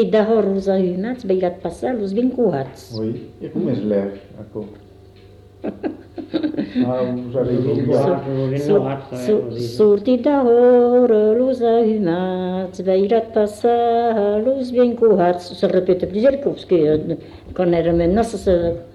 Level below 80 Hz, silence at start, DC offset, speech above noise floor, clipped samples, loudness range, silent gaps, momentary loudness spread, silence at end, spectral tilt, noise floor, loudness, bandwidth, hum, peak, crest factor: -44 dBFS; 0 s; under 0.1%; 27 dB; under 0.1%; 10 LU; none; 13 LU; 0.05 s; -8 dB/octave; -44 dBFS; -18 LUFS; 12 kHz; none; -6 dBFS; 12 dB